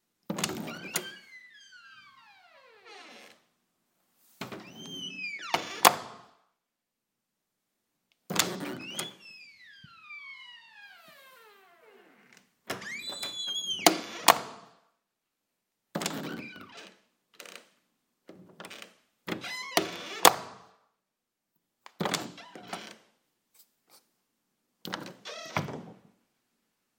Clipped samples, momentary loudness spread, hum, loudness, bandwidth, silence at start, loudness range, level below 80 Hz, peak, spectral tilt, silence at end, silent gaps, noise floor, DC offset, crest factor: under 0.1%; 27 LU; none; -30 LUFS; 16.5 kHz; 0.3 s; 16 LU; -80 dBFS; 0 dBFS; -2 dB/octave; 1.05 s; none; -86 dBFS; under 0.1%; 36 dB